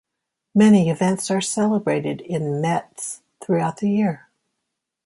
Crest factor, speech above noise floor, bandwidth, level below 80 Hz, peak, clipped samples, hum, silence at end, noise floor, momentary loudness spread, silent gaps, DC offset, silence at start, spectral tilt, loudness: 16 dB; 62 dB; 11.5 kHz; -64 dBFS; -4 dBFS; under 0.1%; none; 0.9 s; -81 dBFS; 16 LU; none; under 0.1%; 0.55 s; -6 dB/octave; -20 LUFS